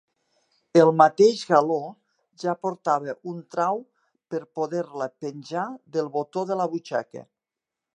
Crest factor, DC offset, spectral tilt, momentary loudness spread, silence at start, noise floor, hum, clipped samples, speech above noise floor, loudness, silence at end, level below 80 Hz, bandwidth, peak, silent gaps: 24 dB; under 0.1%; -6 dB/octave; 17 LU; 0.75 s; -88 dBFS; none; under 0.1%; 64 dB; -24 LUFS; 0.7 s; -80 dBFS; 10 kHz; -2 dBFS; none